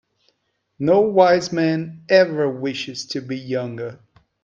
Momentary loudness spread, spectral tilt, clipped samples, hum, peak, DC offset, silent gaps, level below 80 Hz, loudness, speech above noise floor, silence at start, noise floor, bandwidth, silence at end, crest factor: 13 LU; -5.5 dB/octave; under 0.1%; none; 0 dBFS; under 0.1%; none; -62 dBFS; -19 LUFS; 52 dB; 0.8 s; -71 dBFS; 7.6 kHz; 0.5 s; 20 dB